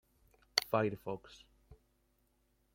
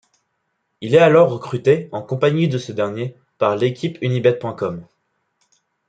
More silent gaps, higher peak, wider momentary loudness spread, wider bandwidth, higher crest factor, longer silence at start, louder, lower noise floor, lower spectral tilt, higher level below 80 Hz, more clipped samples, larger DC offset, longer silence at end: neither; second, -8 dBFS vs -2 dBFS; about the same, 13 LU vs 14 LU; first, 16.5 kHz vs 9 kHz; first, 32 dB vs 16 dB; second, 0.55 s vs 0.8 s; second, -36 LUFS vs -18 LUFS; first, -76 dBFS vs -72 dBFS; second, -3.5 dB/octave vs -7 dB/octave; second, -70 dBFS vs -64 dBFS; neither; neither; about the same, 1 s vs 1.05 s